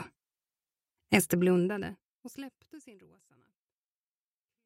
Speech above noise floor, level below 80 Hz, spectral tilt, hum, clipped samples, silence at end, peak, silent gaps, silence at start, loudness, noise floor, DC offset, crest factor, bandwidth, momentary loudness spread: over 59 dB; -68 dBFS; -5 dB/octave; none; under 0.1%; 1.75 s; -6 dBFS; 2.05-2.21 s; 0 s; -28 LUFS; under -90 dBFS; under 0.1%; 28 dB; 16 kHz; 23 LU